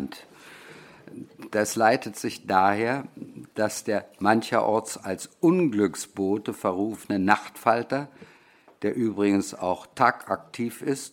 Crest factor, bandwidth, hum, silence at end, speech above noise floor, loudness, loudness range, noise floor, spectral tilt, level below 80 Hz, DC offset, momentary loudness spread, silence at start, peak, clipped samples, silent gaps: 24 dB; 17 kHz; none; 0.05 s; 31 dB; -25 LUFS; 2 LU; -56 dBFS; -5 dB/octave; -70 dBFS; under 0.1%; 19 LU; 0 s; -2 dBFS; under 0.1%; none